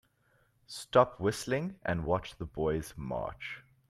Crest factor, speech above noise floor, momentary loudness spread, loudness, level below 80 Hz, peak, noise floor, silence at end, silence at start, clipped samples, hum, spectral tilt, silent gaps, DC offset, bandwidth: 24 dB; 38 dB; 16 LU; -33 LUFS; -54 dBFS; -10 dBFS; -70 dBFS; 0.3 s; 0.7 s; under 0.1%; none; -5.5 dB/octave; none; under 0.1%; 15.5 kHz